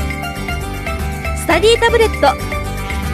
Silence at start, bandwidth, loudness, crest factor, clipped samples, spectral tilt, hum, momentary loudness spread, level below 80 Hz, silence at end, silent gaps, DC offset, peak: 0 s; 15.5 kHz; -16 LUFS; 16 dB; under 0.1%; -4.5 dB/octave; none; 11 LU; -24 dBFS; 0 s; none; under 0.1%; 0 dBFS